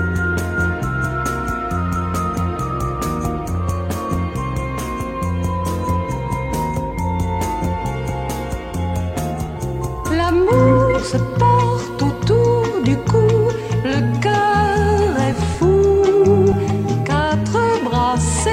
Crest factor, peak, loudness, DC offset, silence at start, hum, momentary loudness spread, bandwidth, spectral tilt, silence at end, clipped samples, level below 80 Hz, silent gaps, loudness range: 14 dB; -2 dBFS; -18 LUFS; under 0.1%; 0 s; none; 10 LU; 16.5 kHz; -6.5 dB/octave; 0 s; under 0.1%; -30 dBFS; none; 7 LU